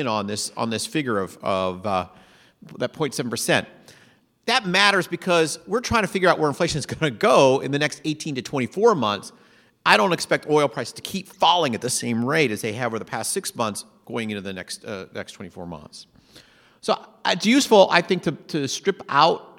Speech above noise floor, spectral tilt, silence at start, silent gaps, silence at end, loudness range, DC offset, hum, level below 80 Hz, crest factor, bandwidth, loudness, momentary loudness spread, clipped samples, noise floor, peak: 34 dB; -4 dB/octave; 0 s; none; 0.1 s; 9 LU; under 0.1%; none; -58 dBFS; 22 dB; 17 kHz; -22 LUFS; 15 LU; under 0.1%; -57 dBFS; 0 dBFS